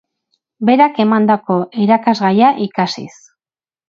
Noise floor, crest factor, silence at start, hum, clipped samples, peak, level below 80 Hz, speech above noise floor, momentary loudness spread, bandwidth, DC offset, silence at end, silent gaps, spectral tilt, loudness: under -90 dBFS; 14 dB; 0.6 s; none; under 0.1%; 0 dBFS; -64 dBFS; over 77 dB; 8 LU; 7.4 kHz; under 0.1%; 0.8 s; none; -6.5 dB/octave; -14 LUFS